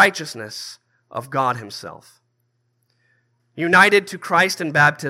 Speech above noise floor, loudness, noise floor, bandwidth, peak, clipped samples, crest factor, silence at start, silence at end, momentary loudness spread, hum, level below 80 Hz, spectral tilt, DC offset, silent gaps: 50 dB; -17 LUFS; -69 dBFS; 16 kHz; 0 dBFS; under 0.1%; 20 dB; 0 s; 0 s; 20 LU; none; -72 dBFS; -4 dB/octave; under 0.1%; none